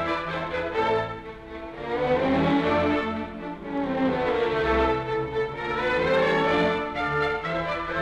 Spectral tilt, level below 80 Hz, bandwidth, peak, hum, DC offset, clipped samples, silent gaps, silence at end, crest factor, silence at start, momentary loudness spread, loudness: -6.5 dB/octave; -44 dBFS; 9.6 kHz; -12 dBFS; none; under 0.1%; under 0.1%; none; 0 s; 14 dB; 0 s; 11 LU; -25 LUFS